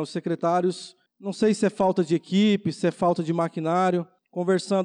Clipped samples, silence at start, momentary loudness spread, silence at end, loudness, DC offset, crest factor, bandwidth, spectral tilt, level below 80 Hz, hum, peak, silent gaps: under 0.1%; 0 s; 11 LU; 0 s; -24 LUFS; under 0.1%; 12 dB; 10.5 kHz; -6.5 dB/octave; -68 dBFS; none; -12 dBFS; none